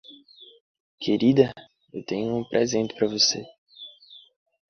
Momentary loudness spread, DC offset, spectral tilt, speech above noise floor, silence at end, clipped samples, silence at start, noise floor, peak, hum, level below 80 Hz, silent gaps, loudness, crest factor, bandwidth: 22 LU; under 0.1%; -4 dB/octave; 27 dB; 0.5 s; under 0.1%; 0.1 s; -51 dBFS; -4 dBFS; none; -64 dBFS; 0.60-0.98 s, 3.58-3.66 s; -23 LUFS; 22 dB; 6.8 kHz